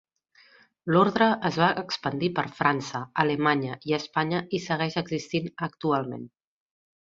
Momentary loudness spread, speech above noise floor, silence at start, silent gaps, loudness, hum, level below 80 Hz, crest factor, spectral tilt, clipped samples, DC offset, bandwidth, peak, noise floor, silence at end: 9 LU; 34 dB; 0.85 s; none; -26 LUFS; none; -66 dBFS; 22 dB; -6 dB/octave; under 0.1%; under 0.1%; 7.6 kHz; -4 dBFS; -60 dBFS; 0.75 s